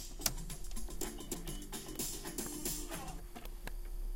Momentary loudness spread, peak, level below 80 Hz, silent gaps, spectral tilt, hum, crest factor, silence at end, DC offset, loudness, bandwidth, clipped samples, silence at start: 11 LU; -14 dBFS; -46 dBFS; none; -2.5 dB/octave; none; 28 dB; 0 s; under 0.1%; -42 LUFS; 17 kHz; under 0.1%; 0 s